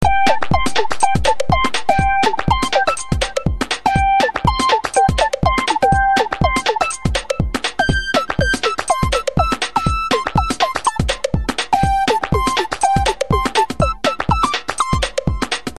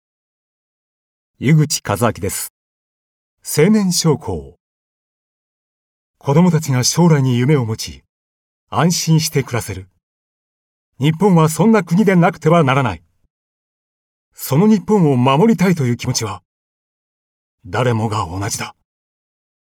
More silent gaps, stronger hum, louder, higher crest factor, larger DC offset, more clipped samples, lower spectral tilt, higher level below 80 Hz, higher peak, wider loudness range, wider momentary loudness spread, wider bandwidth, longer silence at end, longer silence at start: second, none vs 2.50-3.37 s, 4.60-6.14 s, 8.09-8.67 s, 10.03-10.93 s, 13.30-14.32 s, 16.45-17.58 s; neither; about the same, -17 LUFS vs -15 LUFS; about the same, 16 dB vs 16 dB; neither; neither; second, -4 dB/octave vs -5.5 dB/octave; first, -28 dBFS vs -52 dBFS; about the same, 0 dBFS vs 0 dBFS; second, 2 LU vs 5 LU; second, 5 LU vs 14 LU; second, 13 kHz vs 18.5 kHz; second, 0 s vs 0.95 s; second, 0 s vs 1.4 s